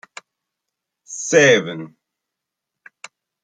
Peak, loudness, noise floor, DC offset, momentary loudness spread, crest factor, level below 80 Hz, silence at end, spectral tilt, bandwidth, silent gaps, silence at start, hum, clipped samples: -2 dBFS; -15 LUFS; -83 dBFS; under 0.1%; 21 LU; 20 dB; -66 dBFS; 1.55 s; -3 dB/octave; 9.4 kHz; none; 1.1 s; none; under 0.1%